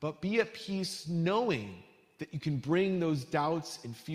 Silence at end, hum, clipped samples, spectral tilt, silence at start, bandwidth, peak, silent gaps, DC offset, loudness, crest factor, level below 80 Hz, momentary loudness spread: 0 s; none; under 0.1%; -6 dB/octave; 0 s; 15 kHz; -14 dBFS; none; under 0.1%; -33 LUFS; 18 dB; -70 dBFS; 13 LU